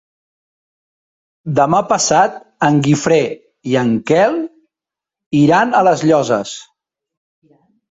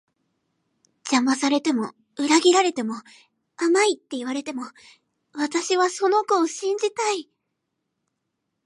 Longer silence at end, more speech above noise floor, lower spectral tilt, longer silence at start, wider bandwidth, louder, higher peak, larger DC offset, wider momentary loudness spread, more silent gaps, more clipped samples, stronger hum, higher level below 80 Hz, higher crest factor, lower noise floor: second, 1.3 s vs 1.45 s; first, 73 dB vs 56 dB; first, -5 dB/octave vs -2 dB/octave; first, 1.45 s vs 1.05 s; second, 8 kHz vs 11.5 kHz; first, -14 LUFS vs -22 LUFS; about the same, -2 dBFS vs -4 dBFS; neither; second, 12 LU vs 15 LU; first, 5.26-5.31 s vs none; neither; neither; first, -54 dBFS vs -80 dBFS; about the same, 16 dB vs 20 dB; first, -87 dBFS vs -79 dBFS